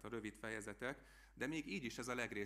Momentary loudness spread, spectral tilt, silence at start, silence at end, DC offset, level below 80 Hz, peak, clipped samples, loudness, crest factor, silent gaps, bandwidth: 5 LU; -4 dB/octave; 0 s; 0 s; under 0.1%; -68 dBFS; -26 dBFS; under 0.1%; -46 LUFS; 20 dB; none; 15.5 kHz